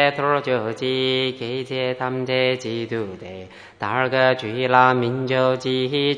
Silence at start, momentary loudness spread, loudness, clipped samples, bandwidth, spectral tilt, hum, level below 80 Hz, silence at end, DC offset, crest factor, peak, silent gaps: 0 s; 12 LU; -21 LUFS; under 0.1%; 10 kHz; -6 dB/octave; none; -64 dBFS; 0 s; under 0.1%; 20 dB; 0 dBFS; none